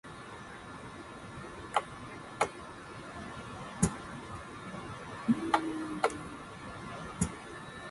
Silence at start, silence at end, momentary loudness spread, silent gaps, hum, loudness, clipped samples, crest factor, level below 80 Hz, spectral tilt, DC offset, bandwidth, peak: 0.05 s; 0 s; 14 LU; none; none; -38 LUFS; under 0.1%; 26 dB; -54 dBFS; -4.5 dB/octave; under 0.1%; 11.5 kHz; -12 dBFS